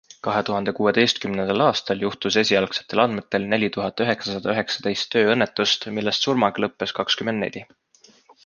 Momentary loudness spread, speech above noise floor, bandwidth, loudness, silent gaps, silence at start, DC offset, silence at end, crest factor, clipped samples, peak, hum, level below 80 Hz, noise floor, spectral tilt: 7 LU; 32 dB; 10 kHz; -22 LUFS; none; 0.25 s; under 0.1%; 0.8 s; 20 dB; under 0.1%; -2 dBFS; none; -60 dBFS; -54 dBFS; -4 dB/octave